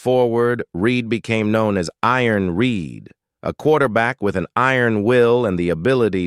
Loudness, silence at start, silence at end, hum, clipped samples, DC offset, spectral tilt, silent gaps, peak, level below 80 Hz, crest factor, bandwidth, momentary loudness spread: -18 LUFS; 0.05 s; 0 s; none; under 0.1%; under 0.1%; -6.5 dB/octave; none; -2 dBFS; -50 dBFS; 16 dB; 13 kHz; 6 LU